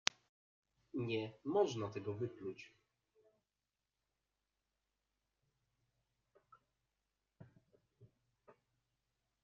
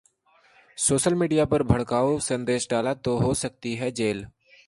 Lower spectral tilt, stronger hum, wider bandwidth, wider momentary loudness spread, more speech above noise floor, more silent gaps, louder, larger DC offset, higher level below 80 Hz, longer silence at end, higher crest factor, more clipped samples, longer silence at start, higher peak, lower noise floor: about the same, -4 dB/octave vs -5 dB/octave; neither; second, 7.2 kHz vs 11.5 kHz; first, 13 LU vs 8 LU; first, over 49 dB vs 37 dB; neither; second, -41 LUFS vs -24 LUFS; neither; second, -84 dBFS vs -46 dBFS; first, 0.9 s vs 0.4 s; first, 40 dB vs 20 dB; neither; first, 0.95 s vs 0.75 s; second, -8 dBFS vs -4 dBFS; first, under -90 dBFS vs -61 dBFS